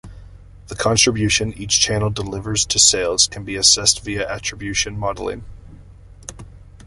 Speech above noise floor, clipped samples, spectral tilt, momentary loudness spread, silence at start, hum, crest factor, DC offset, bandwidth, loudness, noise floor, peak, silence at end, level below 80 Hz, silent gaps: 23 dB; under 0.1%; -2 dB/octave; 20 LU; 0.05 s; none; 20 dB; under 0.1%; 11.5 kHz; -17 LUFS; -42 dBFS; 0 dBFS; 0 s; -40 dBFS; none